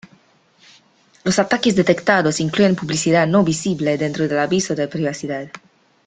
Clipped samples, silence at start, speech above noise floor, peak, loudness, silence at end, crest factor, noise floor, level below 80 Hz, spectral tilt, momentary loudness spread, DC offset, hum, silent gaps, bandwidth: under 0.1%; 1.25 s; 37 dB; -2 dBFS; -18 LUFS; 0.5 s; 18 dB; -55 dBFS; -56 dBFS; -5 dB/octave; 9 LU; under 0.1%; none; none; 9.6 kHz